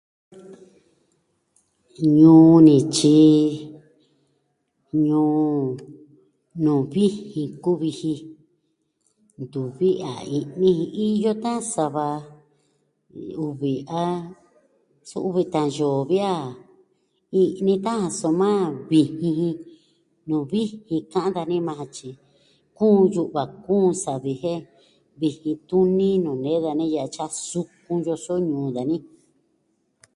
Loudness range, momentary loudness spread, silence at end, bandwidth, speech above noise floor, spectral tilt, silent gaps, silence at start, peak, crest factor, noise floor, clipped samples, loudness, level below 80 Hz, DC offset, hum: 11 LU; 15 LU; 1.15 s; 11.5 kHz; 51 dB; -7 dB/octave; none; 0.35 s; -2 dBFS; 20 dB; -71 dBFS; under 0.1%; -21 LUFS; -64 dBFS; under 0.1%; none